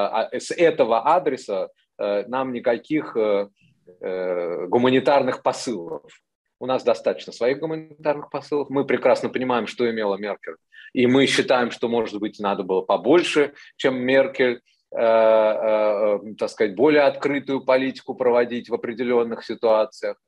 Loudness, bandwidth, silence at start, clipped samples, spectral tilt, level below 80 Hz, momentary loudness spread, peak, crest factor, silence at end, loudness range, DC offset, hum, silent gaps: -21 LUFS; 11.5 kHz; 0 s; under 0.1%; -5 dB/octave; -70 dBFS; 11 LU; -6 dBFS; 16 dB; 0.15 s; 5 LU; under 0.1%; none; 6.35-6.45 s